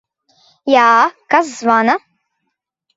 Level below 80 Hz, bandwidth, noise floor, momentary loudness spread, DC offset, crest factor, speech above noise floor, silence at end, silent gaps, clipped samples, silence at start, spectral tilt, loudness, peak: -66 dBFS; 8 kHz; -74 dBFS; 8 LU; under 0.1%; 16 dB; 61 dB; 1 s; none; under 0.1%; 0.65 s; -3.5 dB/octave; -13 LUFS; 0 dBFS